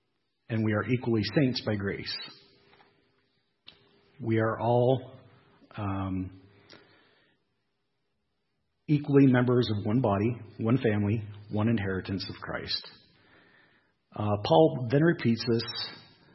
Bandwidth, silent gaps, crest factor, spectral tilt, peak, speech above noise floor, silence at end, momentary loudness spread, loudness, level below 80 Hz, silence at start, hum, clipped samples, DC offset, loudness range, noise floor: 6 kHz; none; 22 dB; -8.5 dB/octave; -8 dBFS; 53 dB; 0.35 s; 14 LU; -28 LUFS; -66 dBFS; 0.5 s; none; under 0.1%; under 0.1%; 8 LU; -80 dBFS